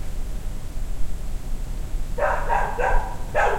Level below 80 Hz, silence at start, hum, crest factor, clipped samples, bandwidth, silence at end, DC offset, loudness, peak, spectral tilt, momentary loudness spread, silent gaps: -26 dBFS; 0 s; none; 16 dB; under 0.1%; 15 kHz; 0 s; under 0.1%; -28 LUFS; -6 dBFS; -5 dB/octave; 12 LU; none